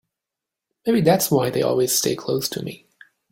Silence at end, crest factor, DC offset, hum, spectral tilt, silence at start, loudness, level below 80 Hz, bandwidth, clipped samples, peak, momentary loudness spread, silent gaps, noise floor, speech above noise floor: 0.55 s; 18 dB; under 0.1%; none; -4.5 dB/octave; 0.85 s; -20 LUFS; -58 dBFS; 17 kHz; under 0.1%; -4 dBFS; 12 LU; none; -86 dBFS; 66 dB